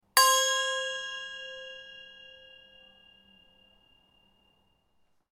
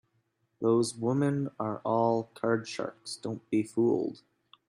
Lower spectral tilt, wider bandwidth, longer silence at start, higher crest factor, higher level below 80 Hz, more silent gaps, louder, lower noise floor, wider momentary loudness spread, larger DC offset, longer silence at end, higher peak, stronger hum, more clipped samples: second, 3.5 dB/octave vs -6.5 dB/octave; first, 16 kHz vs 12 kHz; second, 0.15 s vs 0.6 s; first, 28 dB vs 18 dB; about the same, -76 dBFS vs -72 dBFS; neither; first, -27 LUFS vs -30 LUFS; second, -70 dBFS vs -75 dBFS; first, 28 LU vs 10 LU; neither; first, 3.2 s vs 0.55 s; first, -4 dBFS vs -14 dBFS; neither; neither